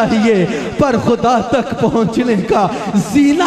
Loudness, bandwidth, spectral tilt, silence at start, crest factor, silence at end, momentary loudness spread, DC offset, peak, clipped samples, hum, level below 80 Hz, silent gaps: -14 LUFS; 13.5 kHz; -6 dB/octave; 0 s; 12 dB; 0 s; 3 LU; under 0.1%; 0 dBFS; under 0.1%; none; -40 dBFS; none